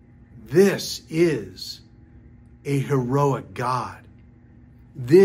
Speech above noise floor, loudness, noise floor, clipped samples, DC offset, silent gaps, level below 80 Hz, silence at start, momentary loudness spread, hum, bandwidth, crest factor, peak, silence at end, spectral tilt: 29 dB; -22 LUFS; -49 dBFS; under 0.1%; under 0.1%; none; -54 dBFS; 0.35 s; 18 LU; none; 16 kHz; 20 dB; -4 dBFS; 0 s; -6.5 dB/octave